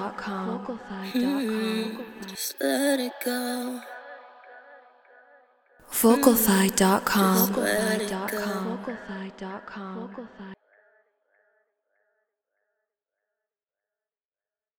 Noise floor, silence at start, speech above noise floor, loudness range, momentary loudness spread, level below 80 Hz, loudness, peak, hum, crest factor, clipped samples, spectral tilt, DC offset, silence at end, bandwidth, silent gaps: under -90 dBFS; 0 s; over 64 dB; 18 LU; 18 LU; -62 dBFS; -25 LUFS; -4 dBFS; none; 24 dB; under 0.1%; -4 dB/octave; under 0.1%; 4.25 s; over 20 kHz; none